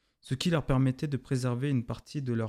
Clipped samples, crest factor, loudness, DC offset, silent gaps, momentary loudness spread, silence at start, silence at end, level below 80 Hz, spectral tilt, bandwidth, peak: under 0.1%; 18 dB; -31 LUFS; under 0.1%; none; 9 LU; 0.25 s; 0 s; -48 dBFS; -6.5 dB/octave; 13 kHz; -12 dBFS